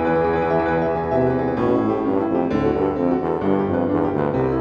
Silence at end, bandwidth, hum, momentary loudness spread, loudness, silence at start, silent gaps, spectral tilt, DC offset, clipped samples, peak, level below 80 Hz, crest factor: 0 s; 6.8 kHz; none; 2 LU; -20 LUFS; 0 s; none; -9.5 dB/octave; under 0.1%; under 0.1%; -6 dBFS; -44 dBFS; 12 dB